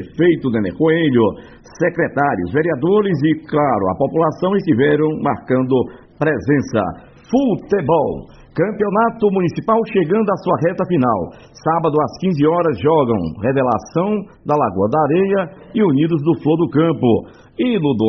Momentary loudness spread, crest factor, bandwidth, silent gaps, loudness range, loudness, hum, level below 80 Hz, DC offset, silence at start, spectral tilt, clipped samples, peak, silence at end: 6 LU; 14 dB; 6.4 kHz; none; 2 LU; -17 LUFS; none; -48 dBFS; under 0.1%; 0 s; -6.5 dB/octave; under 0.1%; -2 dBFS; 0 s